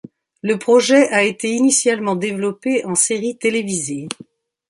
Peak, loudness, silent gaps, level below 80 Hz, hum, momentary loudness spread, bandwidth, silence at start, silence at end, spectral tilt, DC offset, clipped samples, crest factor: -2 dBFS; -17 LUFS; none; -66 dBFS; none; 12 LU; 11.5 kHz; 0.45 s; 0.55 s; -3 dB/octave; under 0.1%; under 0.1%; 16 dB